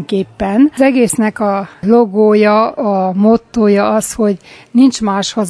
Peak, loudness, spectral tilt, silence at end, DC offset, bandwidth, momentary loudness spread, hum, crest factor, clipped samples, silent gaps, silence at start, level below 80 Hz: 0 dBFS; -12 LUFS; -5.5 dB/octave; 0 s; under 0.1%; 11 kHz; 7 LU; none; 12 dB; under 0.1%; none; 0 s; -44 dBFS